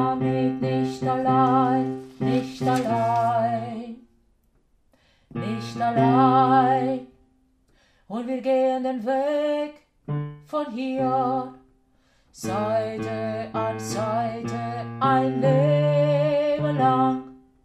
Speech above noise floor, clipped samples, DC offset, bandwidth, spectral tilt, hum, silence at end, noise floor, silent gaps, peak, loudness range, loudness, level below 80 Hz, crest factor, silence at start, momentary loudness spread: 41 dB; under 0.1%; under 0.1%; 13.5 kHz; -7.5 dB/octave; none; 0.3 s; -63 dBFS; none; -6 dBFS; 6 LU; -23 LUFS; -60 dBFS; 18 dB; 0 s; 12 LU